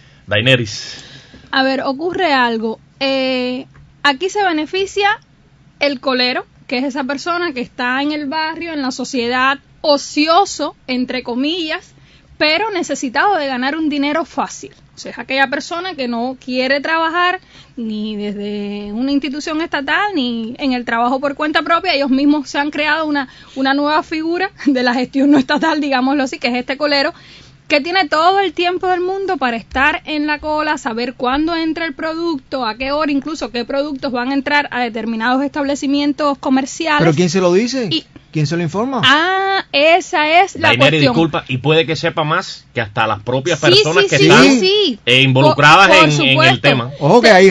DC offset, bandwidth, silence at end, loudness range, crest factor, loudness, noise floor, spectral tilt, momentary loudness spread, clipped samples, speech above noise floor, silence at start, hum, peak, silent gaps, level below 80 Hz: under 0.1%; 11 kHz; 0 s; 7 LU; 16 dB; -15 LUFS; -48 dBFS; -4.5 dB/octave; 11 LU; 0.1%; 33 dB; 0.3 s; none; 0 dBFS; none; -48 dBFS